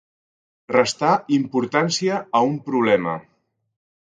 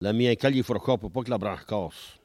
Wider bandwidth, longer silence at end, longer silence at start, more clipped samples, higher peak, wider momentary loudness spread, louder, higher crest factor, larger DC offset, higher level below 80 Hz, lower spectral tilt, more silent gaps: second, 9.6 kHz vs 14.5 kHz; first, 0.95 s vs 0.1 s; first, 0.7 s vs 0 s; neither; first, 0 dBFS vs -8 dBFS; second, 3 LU vs 9 LU; first, -20 LUFS vs -27 LUFS; about the same, 22 dB vs 18 dB; neither; second, -66 dBFS vs -54 dBFS; second, -4.5 dB/octave vs -7 dB/octave; neither